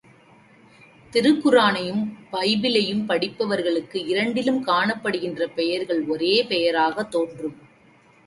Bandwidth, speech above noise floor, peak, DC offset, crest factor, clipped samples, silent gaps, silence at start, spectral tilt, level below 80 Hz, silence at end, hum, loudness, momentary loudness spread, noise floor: 11.5 kHz; 33 dB; -4 dBFS; under 0.1%; 18 dB; under 0.1%; none; 1.1 s; -5 dB/octave; -66 dBFS; 0.7 s; none; -22 LUFS; 8 LU; -54 dBFS